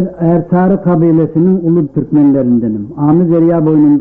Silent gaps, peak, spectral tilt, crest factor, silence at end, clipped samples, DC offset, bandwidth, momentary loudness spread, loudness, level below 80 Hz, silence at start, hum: none; -2 dBFS; -13.5 dB/octave; 8 dB; 0 s; under 0.1%; under 0.1%; 2.9 kHz; 4 LU; -10 LUFS; -42 dBFS; 0 s; none